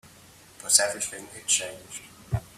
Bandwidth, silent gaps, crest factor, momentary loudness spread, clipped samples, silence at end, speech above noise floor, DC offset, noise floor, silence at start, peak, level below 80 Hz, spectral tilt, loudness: 16 kHz; none; 26 dB; 20 LU; under 0.1%; 0.1 s; 25 dB; under 0.1%; -52 dBFS; 0.05 s; -2 dBFS; -52 dBFS; -1 dB/octave; -24 LUFS